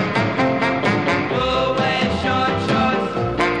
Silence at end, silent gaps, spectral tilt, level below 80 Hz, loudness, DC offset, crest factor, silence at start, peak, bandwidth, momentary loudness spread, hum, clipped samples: 0 s; none; -6 dB/octave; -40 dBFS; -19 LUFS; 0.3%; 14 dB; 0 s; -4 dBFS; 11 kHz; 1 LU; none; under 0.1%